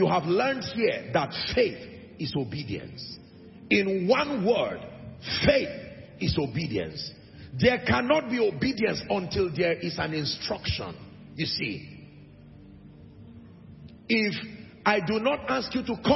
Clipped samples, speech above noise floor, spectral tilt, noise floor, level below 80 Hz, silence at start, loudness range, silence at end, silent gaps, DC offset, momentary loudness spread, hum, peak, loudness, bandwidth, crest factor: under 0.1%; 22 dB; -6 dB/octave; -49 dBFS; -52 dBFS; 0 s; 7 LU; 0 s; none; under 0.1%; 17 LU; none; -8 dBFS; -27 LUFS; 6 kHz; 20 dB